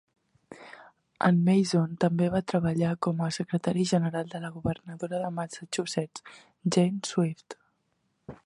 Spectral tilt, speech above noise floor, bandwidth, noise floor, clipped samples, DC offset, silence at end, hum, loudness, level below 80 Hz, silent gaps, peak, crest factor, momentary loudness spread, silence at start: -6 dB/octave; 47 dB; 11.5 kHz; -75 dBFS; under 0.1%; under 0.1%; 0.1 s; none; -28 LUFS; -60 dBFS; none; -8 dBFS; 20 dB; 21 LU; 0.5 s